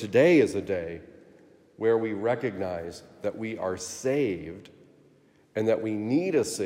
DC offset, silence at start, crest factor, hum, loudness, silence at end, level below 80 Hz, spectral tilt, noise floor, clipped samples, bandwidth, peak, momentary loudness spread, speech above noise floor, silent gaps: under 0.1%; 0 s; 18 dB; none; -27 LUFS; 0 s; -68 dBFS; -5.5 dB/octave; -60 dBFS; under 0.1%; 16 kHz; -8 dBFS; 15 LU; 34 dB; none